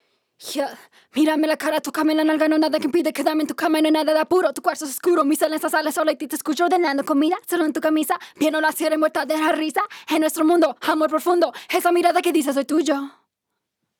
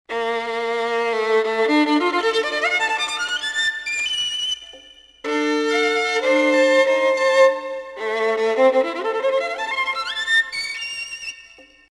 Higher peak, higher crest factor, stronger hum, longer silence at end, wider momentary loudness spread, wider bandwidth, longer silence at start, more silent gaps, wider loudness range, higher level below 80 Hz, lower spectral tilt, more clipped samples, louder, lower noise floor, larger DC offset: about the same, -4 dBFS vs -4 dBFS; about the same, 16 dB vs 18 dB; neither; first, 0.9 s vs 0.3 s; second, 7 LU vs 11 LU; first, 18.5 kHz vs 12 kHz; first, 0.4 s vs 0.1 s; neither; second, 1 LU vs 4 LU; second, -78 dBFS vs -62 dBFS; first, -2.5 dB/octave vs -1 dB/octave; neither; about the same, -20 LUFS vs -19 LUFS; first, -80 dBFS vs -47 dBFS; neither